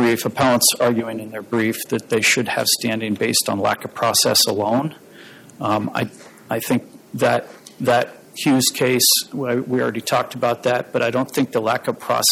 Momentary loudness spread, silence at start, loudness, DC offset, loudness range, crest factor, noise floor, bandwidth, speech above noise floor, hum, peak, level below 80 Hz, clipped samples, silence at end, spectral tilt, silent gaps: 10 LU; 0 s; -19 LUFS; under 0.1%; 5 LU; 16 dB; -43 dBFS; 17 kHz; 23 dB; none; -2 dBFS; -62 dBFS; under 0.1%; 0 s; -3 dB/octave; none